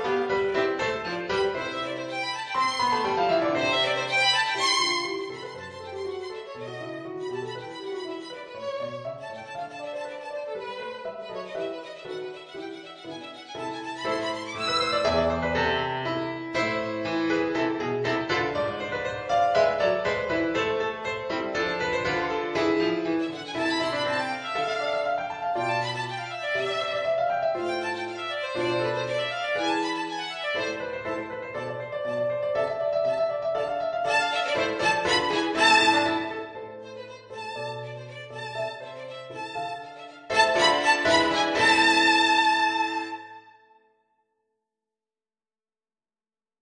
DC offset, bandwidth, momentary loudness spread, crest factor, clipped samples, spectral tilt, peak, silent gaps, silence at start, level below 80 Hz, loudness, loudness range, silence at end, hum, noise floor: under 0.1%; 10 kHz; 16 LU; 22 dB; under 0.1%; -3.5 dB/octave; -4 dBFS; none; 0 s; -58 dBFS; -26 LUFS; 13 LU; 3.1 s; none; under -90 dBFS